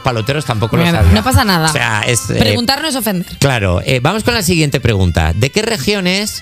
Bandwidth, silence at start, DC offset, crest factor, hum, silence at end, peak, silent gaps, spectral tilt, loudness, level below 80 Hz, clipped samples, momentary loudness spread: 16.5 kHz; 0 s; under 0.1%; 12 dB; none; 0 s; 0 dBFS; none; -4.5 dB/octave; -13 LUFS; -30 dBFS; 0.1%; 5 LU